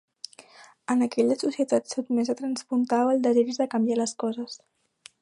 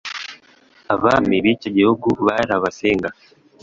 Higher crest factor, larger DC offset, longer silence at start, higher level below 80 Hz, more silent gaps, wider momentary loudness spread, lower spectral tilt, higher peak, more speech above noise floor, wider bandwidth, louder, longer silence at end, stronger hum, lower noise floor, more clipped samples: about the same, 16 dB vs 18 dB; neither; first, 0.6 s vs 0.05 s; second, -78 dBFS vs -50 dBFS; neither; first, 18 LU vs 13 LU; second, -4.5 dB/octave vs -6 dB/octave; second, -10 dBFS vs -2 dBFS; second, 27 dB vs 34 dB; first, 11 kHz vs 7.8 kHz; second, -25 LUFS vs -18 LUFS; first, 0.65 s vs 0.5 s; neither; about the same, -52 dBFS vs -52 dBFS; neither